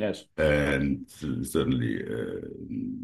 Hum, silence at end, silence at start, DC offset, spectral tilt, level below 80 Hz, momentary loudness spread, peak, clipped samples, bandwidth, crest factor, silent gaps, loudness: none; 0 s; 0 s; under 0.1%; -6 dB/octave; -46 dBFS; 11 LU; -10 dBFS; under 0.1%; 12.5 kHz; 18 dB; none; -29 LUFS